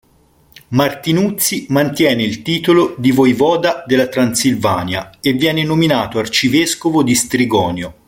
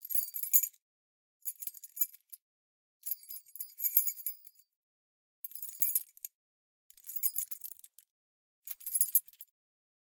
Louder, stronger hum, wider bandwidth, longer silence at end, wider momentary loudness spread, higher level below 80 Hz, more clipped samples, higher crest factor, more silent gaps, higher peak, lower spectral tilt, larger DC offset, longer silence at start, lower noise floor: first, -14 LUFS vs -32 LUFS; neither; second, 17 kHz vs 19 kHz; second, 0.15 s vs 0.6 s; second, 5 LU vs 21 LU; first, -48 dBFS vs under -90 dBFS; neither; second, 14 dB vs 34 dB; second, none vs 0.81-1.40 s, 2.41-3.00 s, 4.76-5.43 s, 6.34-6.90 s, 8.10-8.62 s; first, 0 dBFS vs -4 dBFS; first, -4.5 dB/octave vs 4.5 dB/octave; neither; first, 0.7 s vs 0 s; second, -51 dBFS vs under -90 dBFS